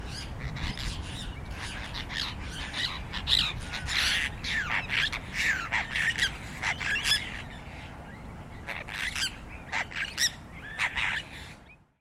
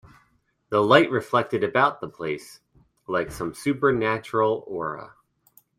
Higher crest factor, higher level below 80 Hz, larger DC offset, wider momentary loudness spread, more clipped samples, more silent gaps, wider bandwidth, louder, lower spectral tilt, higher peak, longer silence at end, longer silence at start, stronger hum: about the same, 22 dB vs 22 dB; first, -44 dBFS vs -58 dBFS; neither; first, 17 LU vs 13 LU; neither; neither; about the same, 16 kHz vs 15.5 kHz; second, -30 LUFS vs -23 LUFS; second, -2 dB/octave vs -6 dB/octave; second, -10 dBFS vs -2 dBFS; second, 0.25 s vs 0.7 s; second, 0 s vs 0.7 s; neither